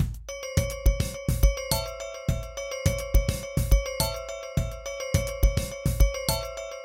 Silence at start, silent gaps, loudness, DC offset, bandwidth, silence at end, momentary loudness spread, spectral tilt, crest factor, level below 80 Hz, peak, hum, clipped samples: 0 s; none; -28 LUFS; under 0.1%; 17 kHz; 0 s; 8 LU; -4.5 dB/octave; 20 dB; -28 dBFS; -6 dBFS; none; under 0.1%